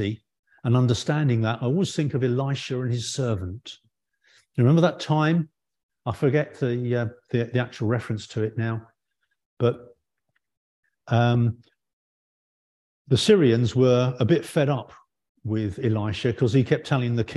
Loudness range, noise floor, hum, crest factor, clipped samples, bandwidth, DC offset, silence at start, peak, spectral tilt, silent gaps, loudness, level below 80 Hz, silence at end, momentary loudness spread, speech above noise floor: 6 LU; -77 dBFS; none; 20 dB; under 0.1%; 12 kHz; under 0.1%; 0 s; -6 dBFS; -7 dB/octave; 0.39-0.43 s, 5.83-5.89 s, 9.46-9.57 s, 10.57-10.83 s, 11.93-13.05 s, 15.29-15.35 s; -24 LUFS; -52 dBFS; 0 s; 11 LU; 55 dB